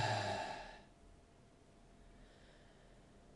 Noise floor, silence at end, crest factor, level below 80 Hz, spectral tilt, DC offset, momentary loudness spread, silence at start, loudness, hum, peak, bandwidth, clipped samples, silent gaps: -65 dBFS; 0 s; 22 dB; -66 dBFS; -4 dB/octave; under 0.1%; 25 LU; 0 s; -43 LUFS; none; -26 dBFS; 11.5 kHz; under 0.1%; none